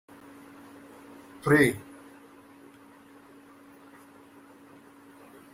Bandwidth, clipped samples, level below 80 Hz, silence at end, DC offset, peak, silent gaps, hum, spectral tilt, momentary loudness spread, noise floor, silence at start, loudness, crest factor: 16 kHz; under 0.1%; -64 dBFS; 3.75 s; under 0.1%; -8 dBFS; none; none; -6 dB/octave; 30 LU; -53 dBFS; 1.45 s; -24 LUFS; 26 dB